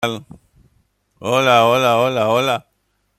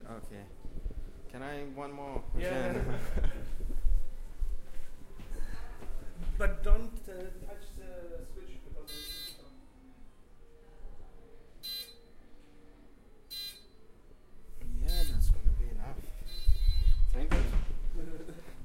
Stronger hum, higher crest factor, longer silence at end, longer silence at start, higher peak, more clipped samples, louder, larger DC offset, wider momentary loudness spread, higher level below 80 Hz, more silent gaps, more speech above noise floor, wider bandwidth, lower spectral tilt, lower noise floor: neither; about the same, 16 dB vs 18 dB; first, 0.6 s vs 0 s; about the same, 0 s vs 0 s; first, -2 dBFS vs -12 dBFS; neither; first, -16 LUFS vs -38 LUFS; neither; second, 13 LU vs 21 LU; second, -58 dBFS vs -32 dBFS; neither; first, 46 dB vs 24 dB; about the same, 15 kHz vs 15 kHz; about the same, -4.5 dB/octave vs -5.5 dB/octave; first, -62 dBFS vs -54 dBFS